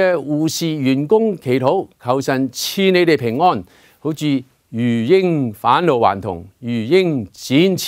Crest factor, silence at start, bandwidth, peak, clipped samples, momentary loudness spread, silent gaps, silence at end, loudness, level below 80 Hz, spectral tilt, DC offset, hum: 16 dB; 0 s; 16 kHz; 0 dBFS; under 0.1%; 10 LU; none; 0 s; -17 LUFS; -58 dBFS; -5.5 dB/octave; under 0.1%; none